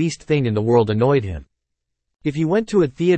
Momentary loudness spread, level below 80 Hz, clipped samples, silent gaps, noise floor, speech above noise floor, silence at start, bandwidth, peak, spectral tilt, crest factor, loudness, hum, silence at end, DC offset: 10 LU; -46 dBFS; under 0.1%; none; -78 dBFS; 60 dB; 0 s; 8.8 kHz; -4 dBFS; -7 dB/octave; 16 dB; -19 LUFS; none; 0 s; under 0.1%